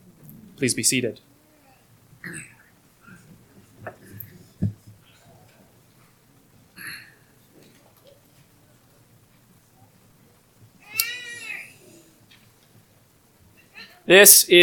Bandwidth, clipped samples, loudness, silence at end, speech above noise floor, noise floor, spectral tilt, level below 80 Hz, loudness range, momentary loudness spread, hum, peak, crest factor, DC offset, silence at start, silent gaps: 19 kHz; under 0.1%; -17 LUFS; 0 s; 43 dB; -58 dBFS; -2 dB/octave; -64 dBFS; 17 LU; 32 LU; none; 0 dBFS; 26 dB; under 0.1%; 0.6 s; none